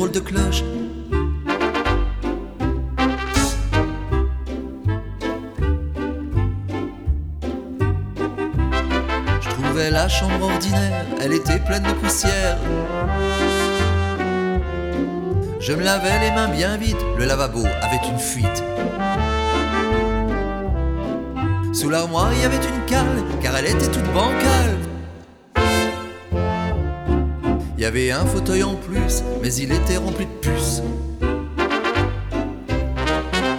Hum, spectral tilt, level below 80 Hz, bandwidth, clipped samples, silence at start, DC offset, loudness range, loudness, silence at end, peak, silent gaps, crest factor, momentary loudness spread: none; -5 dB/octave; -26 dBFS; 18 kHz; under 0.1%; 0 s; under 0.1%; 4 LU; -21 LUFS; 0 s; -4 dBFS; none; 16 dB; 7 LU